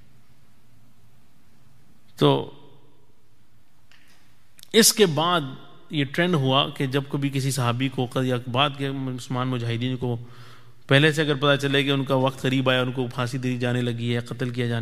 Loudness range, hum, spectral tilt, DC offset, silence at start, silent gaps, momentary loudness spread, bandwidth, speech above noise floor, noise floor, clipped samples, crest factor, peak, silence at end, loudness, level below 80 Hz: 8 LU; none; -4.5 dB/octave; 0.8%; 2.2 s; none; 10 LU; 15.5 kHz; 39 dB; -62 dBFS; under 0.1%; 24 dB; 0 dBFS; 0 s; -23 LUFS; -62 dBFS